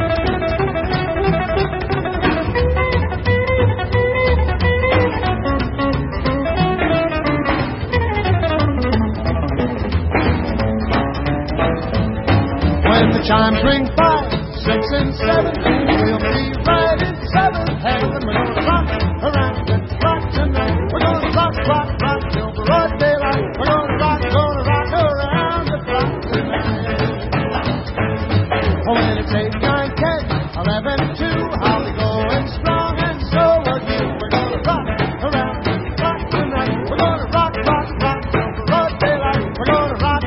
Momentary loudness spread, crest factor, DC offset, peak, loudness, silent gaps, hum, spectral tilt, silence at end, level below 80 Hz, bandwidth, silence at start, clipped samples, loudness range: 5 LU; 16 dB; 0.1%; -2 dBFS; -17 LUFS; none; none; -11 dB/octave; 0 s; -26 dBFS; 5.8 kHz; 0 s; under 0.1%; 3 LU